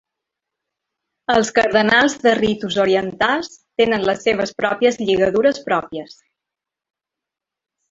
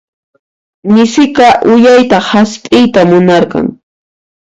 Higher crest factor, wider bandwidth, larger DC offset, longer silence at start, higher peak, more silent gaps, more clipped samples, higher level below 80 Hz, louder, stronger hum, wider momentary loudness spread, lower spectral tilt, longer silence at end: first, 18 dB vs 8 dB; about the same, 8 kHz vs 8.6 kHz; neither; first, 1.3 s vs 0.85 s; about the same, 0 dBFS vs 0 dBFS; neither; second, under 0.1% vs 0.6%; second, -54 dBFS vs -44 dBFS; second, -17 LUFS vs -7 LUFS; neither; about the same, 8 LU vs 8 LU; second, -4 dB/octave vs -5.5 dB/octave; first, 1.85 s vs 0.65 s